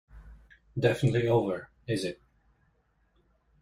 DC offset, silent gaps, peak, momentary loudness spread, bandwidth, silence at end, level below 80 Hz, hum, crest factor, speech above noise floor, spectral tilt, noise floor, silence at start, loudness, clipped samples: under 0.1%; none; -12 dBFS; 13 LU; 14.5 kHz; 1.5 s; -56 dBFS; none; 20 dB; 43 dB; -7 dB/octave; -70 dBFS; 0.15 s; -29 LUFS; under 0.1%